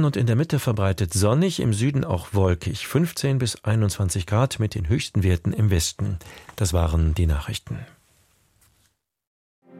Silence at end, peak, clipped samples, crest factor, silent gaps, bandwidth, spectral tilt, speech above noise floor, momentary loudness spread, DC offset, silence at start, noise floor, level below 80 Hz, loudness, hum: 0 s; -6 dBFS; under 0.1%; 16 dB; 9.27-9.62 s; 16 kHz; -5.5 dB/octave; 46 dB; 7 LU; under 0.1%; 0 s; -67 dBFS; -34 dBFS; -23 LUFS; none